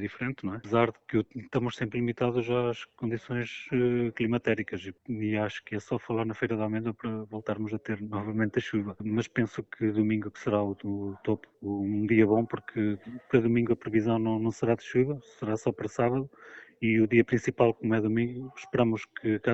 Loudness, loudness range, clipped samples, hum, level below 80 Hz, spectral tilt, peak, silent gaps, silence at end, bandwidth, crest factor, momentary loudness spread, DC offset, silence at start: -29 LUFS; 5 LU; under 0.1%; none; -60 dBFS; -7.5 dB/octave; -8 dBFS; none; 0 s; 8 kHz; 20 dB; 9 LU; under 0.1%; 0 s